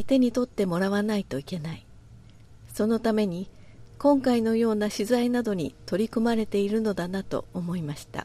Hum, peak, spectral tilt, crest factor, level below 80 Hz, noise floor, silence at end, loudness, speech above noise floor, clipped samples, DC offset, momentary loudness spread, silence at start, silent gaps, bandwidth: none; -10 dBFS; -6.5 dB/octave; 16 dB; -54 dBFS; -49 dBFS; 0 s; -26 LUFS; 24 dB; under 0.1%; under 0.1%; 11 LU; 0 s; none; 14.5 kHz